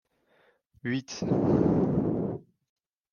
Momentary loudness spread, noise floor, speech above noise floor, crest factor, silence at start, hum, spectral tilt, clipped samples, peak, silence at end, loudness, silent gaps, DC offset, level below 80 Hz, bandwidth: 12 LU; -66 dBFS; 41 dB; 16 dB; 0.85 s; none; -7.5 dB/octave; under 0.1%; -12 dBFS; 0.7 s; -28 LUFS; none; under 0.1%; -54 dBFS; 7 kHz